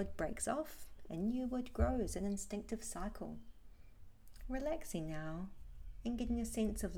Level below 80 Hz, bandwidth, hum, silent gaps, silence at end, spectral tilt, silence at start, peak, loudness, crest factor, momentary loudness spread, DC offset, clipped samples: -48 dBFS; 18.5 kHz; none; none; 0 s; -5.5 dB/octave; 0 s; -22 dBFS; -42 LUFS; 20 dB; 13 LU; under 0.1%; under 0.1%